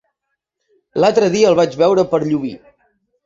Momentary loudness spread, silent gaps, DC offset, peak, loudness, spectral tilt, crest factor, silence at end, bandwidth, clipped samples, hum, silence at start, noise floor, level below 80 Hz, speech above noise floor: 10 LU; none; under 0.1%; -2 dBFS; -15 LUFS; -5.5 dB/octave; 16 dB; 0.7 s; 7.8 kHz; under 0.1%; none; 0.95 s; -76 dBFS; -56 dBFS; 62 dB